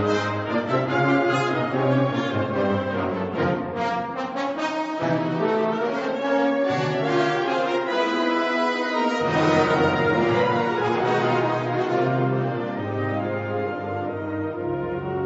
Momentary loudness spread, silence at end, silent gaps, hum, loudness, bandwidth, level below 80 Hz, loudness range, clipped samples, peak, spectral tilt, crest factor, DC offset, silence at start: 7 LU; 0 s; none; none; -23 LUFS; 8 kHz; -58 dBFS; 4 LU; under 0.1%; -8 dBFS; -6.5 dB/octave; 16 dB; under 0.1%; 0 s